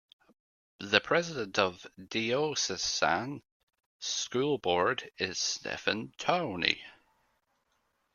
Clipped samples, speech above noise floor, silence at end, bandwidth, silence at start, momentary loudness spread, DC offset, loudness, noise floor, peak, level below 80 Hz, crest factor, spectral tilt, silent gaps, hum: under 0.1%; 45 dB; 1.25 s; 12 kHz; 0.8 s; 7 LU; under 0.1%; -30 LUFS; -76 dBFS; -4 dBFS; -68 dBFS; 28 dB; -2.5 dB/octave; 3.52-3.67 s, 3.86-4.00 s; none